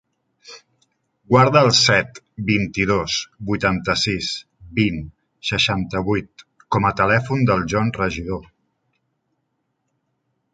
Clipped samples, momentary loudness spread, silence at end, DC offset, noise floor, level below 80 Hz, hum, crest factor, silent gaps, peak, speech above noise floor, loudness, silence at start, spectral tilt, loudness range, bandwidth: under 0.1%; 15 LU; 2.1 s; under 0.1%; -73 dBFS; -44 dBFS; none; 20 dB; none; -2 dBFS; 54 dB; -19 LUFS; 0.45 s; -4.5 dB/octave; 4 LU; 9.4 kHz